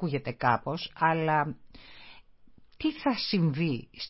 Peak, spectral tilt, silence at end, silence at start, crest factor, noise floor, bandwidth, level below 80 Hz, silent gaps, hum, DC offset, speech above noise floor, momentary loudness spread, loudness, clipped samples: -10 dBFS; -9.5 dB/octave; 0 s; 0 s; 20 dB; -54 dBFS; 5.8 kHz; -60 dBFS; none; none; under 0.1%; 25 dB; 10 LU; -29 LUFS; under 0.1%